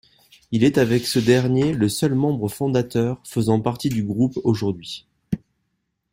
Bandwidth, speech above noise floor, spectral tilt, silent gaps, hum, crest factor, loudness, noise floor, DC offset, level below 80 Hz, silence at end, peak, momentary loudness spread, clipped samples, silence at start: 16 kHz; 54 dB; -6.5 dB/octave; none; none; 18 dB; -21 LUFS; -74 dBFS; under 0.1%; -52 dBFS; 0.75 s; -2 dBFS; 13 LU; under 0.1%; 0.5 s